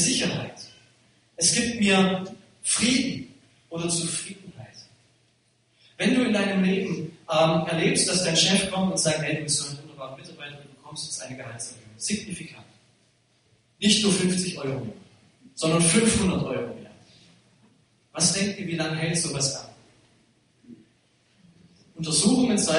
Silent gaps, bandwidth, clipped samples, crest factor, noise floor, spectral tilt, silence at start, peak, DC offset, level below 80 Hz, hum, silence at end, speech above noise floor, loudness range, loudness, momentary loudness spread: none; 11 kHz; under 0.1%; 20 dB; -66 dBFS; -3.5 dB/octave; 0 s; -6 dBFS; under 0.1%; -56 dBFS; none; 0 s; 42 dB; 9 LU; -23 LUFS; 20 LU